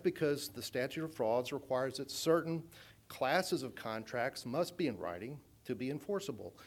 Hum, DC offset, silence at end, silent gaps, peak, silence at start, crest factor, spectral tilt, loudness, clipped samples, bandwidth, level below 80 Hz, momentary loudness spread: none; under 0.1%; 0 s; none; -18 dBFS; 0 s; 20 dB; -4.5 dB/octave; -37 LUFS; under 0.1%; 19 kHz; -74 dBFS; 12 LU